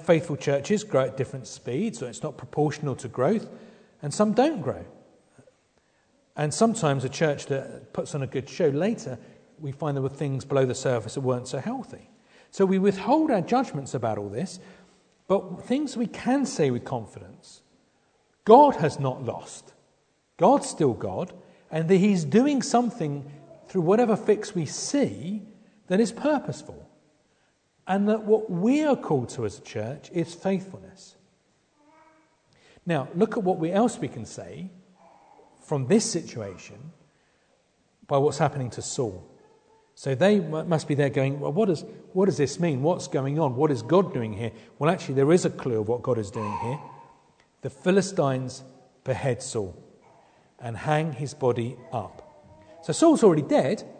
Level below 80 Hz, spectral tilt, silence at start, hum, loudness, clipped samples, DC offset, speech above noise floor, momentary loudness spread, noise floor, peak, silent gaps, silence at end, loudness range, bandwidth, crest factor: -66 dBFS; -6 dB/octave; 0 s; none; -25 LUFS; under 0.1%; under 0.1%; 43 dB; 16 LU; -67 dBFS; -2 dBFS; none; 0 s; 6 LU; 9.4 kHz; 24 dB